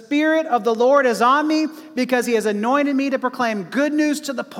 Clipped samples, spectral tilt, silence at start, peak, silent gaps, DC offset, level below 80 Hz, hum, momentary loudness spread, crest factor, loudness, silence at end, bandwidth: under 0.1%; -4.5 dB/octave; 0 s; -4 dBFS; none; under 0.1%; -74 dBFS; none; 7 LU; 14 dB; -19 LUFS; 0 s; 16 kHz